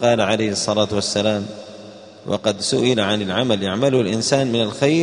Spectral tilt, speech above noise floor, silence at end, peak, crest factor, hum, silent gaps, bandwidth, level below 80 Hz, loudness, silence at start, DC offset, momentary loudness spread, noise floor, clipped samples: -4.5 dB/octave; 21 dB; 0 s; -2 dBFS; 18 dB; none; none; 10.5 kHz; -56 dBFS; -19 LUFS; 0 s; under 0.1%; 12 LU; -39 dBFS; under 0.1%